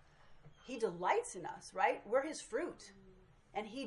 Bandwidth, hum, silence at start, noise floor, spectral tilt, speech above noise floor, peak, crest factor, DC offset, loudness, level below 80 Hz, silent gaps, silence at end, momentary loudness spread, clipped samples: 11.5 kHz; none; 0.25 s; -63 dBFS; -3.5 dB/octave; 24 dB; -18 dBFS; 22 dB; under 0.1%; -39 LUFS; -70 dBFS; none; 0 s; 15 LU; under 0.1%